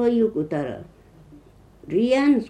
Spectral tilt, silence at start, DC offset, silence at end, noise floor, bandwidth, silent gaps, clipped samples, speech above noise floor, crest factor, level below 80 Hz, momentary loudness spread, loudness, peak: -7 dB/octave; 0 s; under 0.1%; 0 s; -49 dBFS; 9.4 kHz; none; under 0.1%; 29 dB; 14 dB; -56 dBFS; 13 LU; -22 LUFS; -8 dBFS